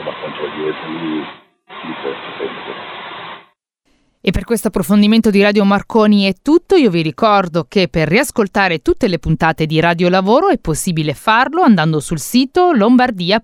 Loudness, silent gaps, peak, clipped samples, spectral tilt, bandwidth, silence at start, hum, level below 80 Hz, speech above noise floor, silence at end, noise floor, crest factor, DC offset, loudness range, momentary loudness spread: -14 LUFS; none; 0 dBFS; under 0.1%; -5.5 dB/octave; 17.5 kHz; 0 s; none; -38 dBFS; 48 dB; 0.05 s; -61 dBFS; 14 dB; under 0.1%; 13 LU; 14 LU